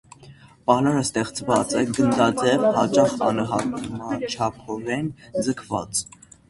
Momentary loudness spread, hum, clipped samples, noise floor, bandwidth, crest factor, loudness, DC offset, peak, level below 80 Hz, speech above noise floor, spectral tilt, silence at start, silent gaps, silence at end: 10 LU; none; under 0.1%; -48 dBFS; 11.5 kHz; 20 dB; -22 LUFS; under 0.1%; -2 dBFS; -54 dBFS; 26 dB; -5 dB/octave; 0.2 s; none; 0.45 s